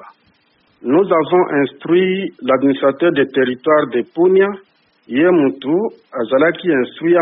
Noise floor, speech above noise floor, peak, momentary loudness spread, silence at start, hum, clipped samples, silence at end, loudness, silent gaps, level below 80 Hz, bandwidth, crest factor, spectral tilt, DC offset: -58 dBFS; 43 dB; -2 dBFS; 7 LU; 0 s; none; under 0.1%; 0 s; -15 LUFS; none; -62 dBFS; 3.9 kHz; 14 dB; -4.5 dB/octave; under 0.1%